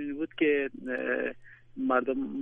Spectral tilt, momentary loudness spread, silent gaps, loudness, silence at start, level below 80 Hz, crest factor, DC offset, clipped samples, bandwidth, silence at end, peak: -7.5 dB/octave; 9 LU; none; -30 LUFS; 0 s; -64 dBFS; 20 dB; under 0.1%; under 0.1%; 3.7 kHz; 0 s; -12 dBFS